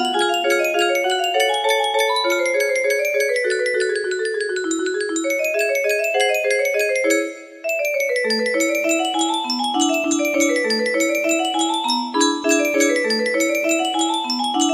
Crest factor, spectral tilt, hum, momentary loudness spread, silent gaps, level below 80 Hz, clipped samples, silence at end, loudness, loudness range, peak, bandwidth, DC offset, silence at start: 16 dB; -1 dB/octave; none; 4 LU; none; -68 dBFS; under 0.1%; 0 s; -19 LUFS; 2 LU; -4 dBFS; 15.5 kHz; under 0.1%; 0 s